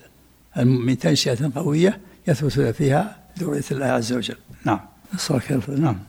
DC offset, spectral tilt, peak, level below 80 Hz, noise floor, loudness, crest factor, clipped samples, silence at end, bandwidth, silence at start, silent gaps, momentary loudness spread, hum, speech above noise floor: under 0.1%; -6 dB/octave; -6 dBFS; -50 dBFS; -53 dBFS; -22 LUFS; 16 dB; under 0.1%; 0.05 s; 16.5 kHz; 0.55 s; none; 10 LU; none; 32 dB